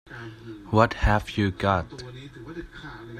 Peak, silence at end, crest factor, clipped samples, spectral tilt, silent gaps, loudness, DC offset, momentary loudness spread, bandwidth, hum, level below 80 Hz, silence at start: -2 dBFS; 0 s; 24 dB; under 0.1%; -7 dB/octave; none; -24 LUFS; under 0.1%; 19 LU; 13 kHz; none; -36 dBFS; 0.1 s